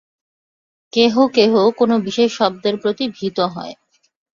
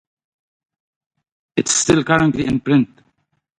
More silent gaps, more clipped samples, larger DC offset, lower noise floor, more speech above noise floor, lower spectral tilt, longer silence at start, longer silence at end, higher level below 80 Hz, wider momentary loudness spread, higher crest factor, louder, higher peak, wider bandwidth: neither; neither; neither; first, under -90 dBFS vs -67 dBFS; first, over 74 dB vs 51 dB; about the same, -5 dB/octave vs -4 dB/octave; second, 0.95 s vs 1.55 s; second, 0.6 s vs 0.75 s; second, -62 dBFS vs -48 dBFS; about the same, 9 LU vs 9 LU; about the same, 16 dB vs 20 dB; about the same, -17 LUFS vs -17 LUFS; about the same, -2 dBFS vs 0 dBFS; second, 7.4 kHz vs 11.5 kHz